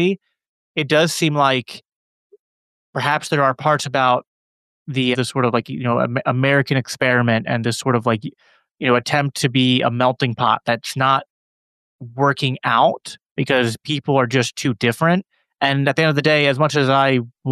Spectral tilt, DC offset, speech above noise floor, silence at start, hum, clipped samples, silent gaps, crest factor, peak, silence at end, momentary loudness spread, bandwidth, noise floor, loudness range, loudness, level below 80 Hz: -5 dB/octave; under 0.1%; over 72 dB; 0 s; none; under 0.1%; 0.48-0.75 s, 1.96-2.30 s, 2.39-2.93 s, 4.27-4.86 s, 8.71-8.75 s, 11.30-11.99 s, 13.31-13.36 s; 16 dB; -2 dBFS; 0 s; 8 LU; 14 kHz; under -90 dBFS; 3 LU; -18 LUFS; -64 dBFS